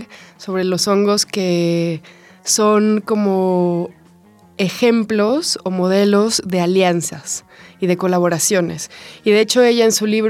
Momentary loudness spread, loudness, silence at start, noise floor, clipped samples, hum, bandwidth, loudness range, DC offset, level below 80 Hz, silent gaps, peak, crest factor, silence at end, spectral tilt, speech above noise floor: 11 LU; -16 LUFS; 0 s; -48 dBFS; under 0.1%; none; 16.5 kHz; 1 LU; under 0.1%; -66 dBFS; none; -2 dBFS; 14 dB; 0 s; -4.5 dB/octave; 32 dB